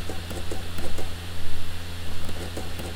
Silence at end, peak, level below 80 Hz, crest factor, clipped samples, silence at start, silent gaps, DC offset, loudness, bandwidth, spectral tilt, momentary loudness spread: 0 s; -10 dBFS; -36 dBFS; 12 dB; under 0.1%; 0 s; none; under 0.1%; -35 LUFS; 16 kHz; -4.5 dB/octave; 2 LU